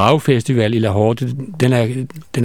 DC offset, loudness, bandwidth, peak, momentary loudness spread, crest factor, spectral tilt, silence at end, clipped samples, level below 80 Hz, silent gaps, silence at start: 0.7%; -17 LUFS; 15.5 kHz; 0 dBFS; 9 LU; 16 dB; -7 dB/octave; 0 s; under 0.1%; -52 dBFS; none; 0 s